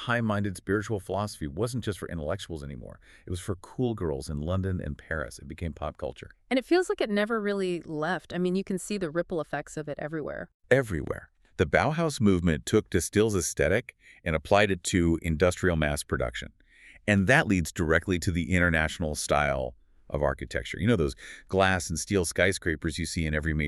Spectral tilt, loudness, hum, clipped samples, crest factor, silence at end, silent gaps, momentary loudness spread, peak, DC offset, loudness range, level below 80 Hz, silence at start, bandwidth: -5 dB/octave; -28 LUFS; none; under 0.1%; 22 dB; 0 s; 10.54-10.60 s; 13 LU; -6 dBFS; under 0.1%; 8 LU; -46 dBFS; 0 s; 13.5 kHz